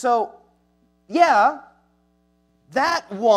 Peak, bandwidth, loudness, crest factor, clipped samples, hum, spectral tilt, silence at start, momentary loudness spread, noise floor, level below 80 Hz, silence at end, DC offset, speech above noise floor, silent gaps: -2 dBFS; 13 kHz; -20 LUFS; 18 dB; under 0.1%; none; -3.5 dB/octave; 0 s; 14 LU; -63 dBFS; -68 dBFS; 0 s; under 0.1%; 45 dB; none